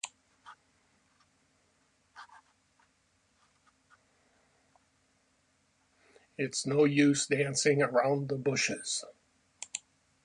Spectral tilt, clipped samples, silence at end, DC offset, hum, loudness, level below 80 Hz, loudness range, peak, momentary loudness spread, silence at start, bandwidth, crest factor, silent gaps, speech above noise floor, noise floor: -4 dB/octave; under 0.1%; 0.45 s; under 0.1%; none; -30 LUFS; -76 dBFS; 11 LU; -14 dBFS; 22 LU; 0.05 s; 11 kHz; 20 dB; none; 43 dB; -72 dBFS